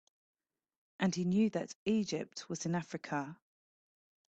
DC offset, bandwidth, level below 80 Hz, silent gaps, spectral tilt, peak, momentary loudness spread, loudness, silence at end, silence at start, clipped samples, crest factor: under 0.1%; 8.4 kHz; -74 dBFS; 1.75-1.86 s; -5.5 dB/octave; -18 dBFS; 9 LU; -36 LUFS; 1 s; 1 s; under 0.1%; 20 dB